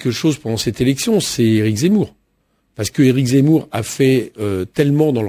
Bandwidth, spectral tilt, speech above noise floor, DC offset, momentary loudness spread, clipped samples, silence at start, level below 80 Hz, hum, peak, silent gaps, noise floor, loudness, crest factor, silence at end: 16 kHz; -6 dB/octave; 48 dB; under 0.1%; 9 LU; under 0.1%; 0 s; -44 dBFS; none; -2 dBFS; none; -64 dBFS; -16 LUFS; 14 dB; 0 s